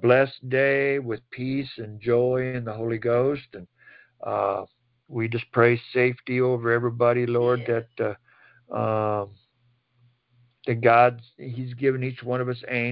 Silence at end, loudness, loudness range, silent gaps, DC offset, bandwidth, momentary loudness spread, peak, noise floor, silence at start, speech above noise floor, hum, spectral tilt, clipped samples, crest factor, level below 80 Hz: 0 s; -24 LUFS; 5 LU; none; under 0.1%; 5.4 kHz; 14 LU; -4 dBFS; -67 dBFS; 0 s; 44 dB; none; -11.5 dB/octave; under 0.1%; 20 dB; -64 dBFS